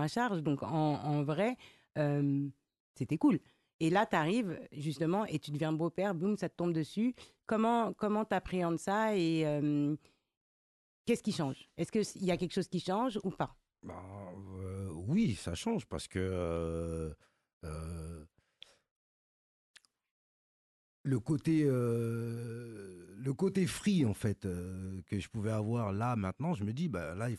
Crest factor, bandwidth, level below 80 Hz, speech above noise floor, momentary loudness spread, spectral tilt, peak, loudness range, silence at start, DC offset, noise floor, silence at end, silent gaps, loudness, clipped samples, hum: 18 dB; 12.5 kHz; -56 dBFS; 28 dB; 13 LU; -6.5 dB/octave; -16 dBFS; 7 LU; 0 s; under 0.1%; -62 dBFS; 0 s; 2.80-2.94 s, 3.74-3.79 s, 10.37-11.05 s, 17.53-17.61 s, 18.91-19.74 s, 20.11-21.04 s; -35 LUFS; under 0.1%; none